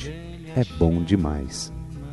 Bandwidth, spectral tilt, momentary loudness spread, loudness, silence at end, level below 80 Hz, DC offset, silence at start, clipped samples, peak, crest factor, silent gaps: 11.5 kHz; -6.5 dB/octave; 14 LU; -25 LUFS; 0 s; -38 dBFS; 0.2%; 0 s; under 0.1%; -4 dBFS; 20 dB; none